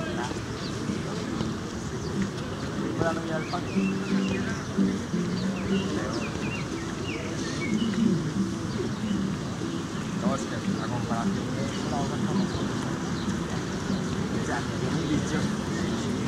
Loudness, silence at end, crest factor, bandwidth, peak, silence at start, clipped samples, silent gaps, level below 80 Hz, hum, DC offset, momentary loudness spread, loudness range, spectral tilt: -29 LUFS; 0 s; 16 dB; 13 kHz; -12 dBFS; 0 s; under 0.1%; none; -48 dBFS; none; under 0.1%; 5 LU; 1 LU; -5.5 dB/octave